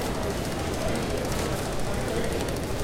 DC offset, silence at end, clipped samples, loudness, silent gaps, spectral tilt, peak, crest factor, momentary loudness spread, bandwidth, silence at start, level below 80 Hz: under 0.1%; 0 s; under 0.1%; -29 LUFS; none; -5 dB/octave; -14 dBFS; 14 dB; 2 LU; 17 kHz; 0 s; -36 dBFS